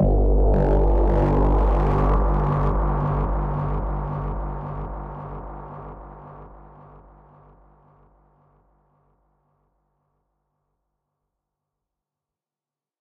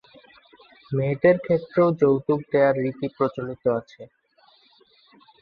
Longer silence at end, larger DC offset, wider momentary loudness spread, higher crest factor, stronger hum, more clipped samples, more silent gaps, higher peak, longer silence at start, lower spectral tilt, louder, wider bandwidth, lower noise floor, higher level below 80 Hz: first, 6.3 s vs 1.35 s; neither; first, 19 LU vs 8 LU; about the same, 14 dB vs 18 dB; neither; neither; neither; second, -10 dBFS vs -6 dBFS; second, 0 s vs 0.9 s; about the same, -10.5 dB/octave vs -10 dB/octave; about the same, -23 LUFS vs -22 LUFS; second, 3.4 kHz vs 5.2 kHz; first, under -90 dBFS vs -59 dBFS; first, -26 dBFS vs -62 dBFS